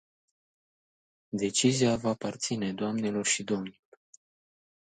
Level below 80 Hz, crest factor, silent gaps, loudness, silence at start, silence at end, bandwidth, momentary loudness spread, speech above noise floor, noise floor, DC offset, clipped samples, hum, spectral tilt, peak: -66 dBFS; 20 dB; none; -29 LUFS; 1.35 s; 1.25 s; 9.6 kHz; 9 LU; over 61 dB; under -90 dBFS; under 0.1%; under 0.1%; none; -4 dB/octave; -12 dBFS